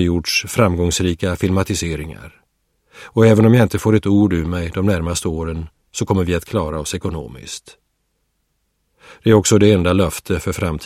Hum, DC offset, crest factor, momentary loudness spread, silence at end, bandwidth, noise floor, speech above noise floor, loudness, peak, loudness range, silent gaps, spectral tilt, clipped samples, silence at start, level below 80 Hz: none; under 0.1%; 18 dB; 16 LU; 0 s; 15.5 kHz; -68 dBFS; 52 dB; -17 LUFS; 0 dBFS; 8 LU; none; -5.5 dB/octave; under 0.1%; 0 s; -36 dBFS